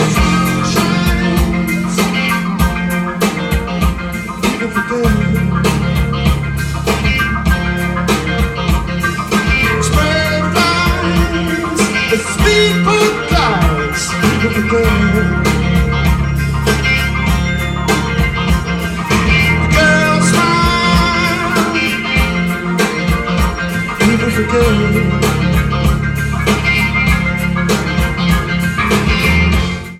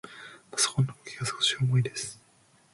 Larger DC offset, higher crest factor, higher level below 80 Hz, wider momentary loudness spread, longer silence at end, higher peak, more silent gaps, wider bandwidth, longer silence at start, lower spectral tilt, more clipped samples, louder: neither; second, 12 dB vs 20 dB; first, -22 dBFS vs -64 dBFS; second, 5 LU vs 13 LU; second, 0 s vs 0.6 s; first, 0 dBFS vs -12 dBFS; neither; first, 16 kHz vs 11.5 kHz; about the same, 0 s vs 0.05 s; first, -5 dB/octave vs -3.5 dB/octave; neither; first, -13 LUFS vs -28 LUFS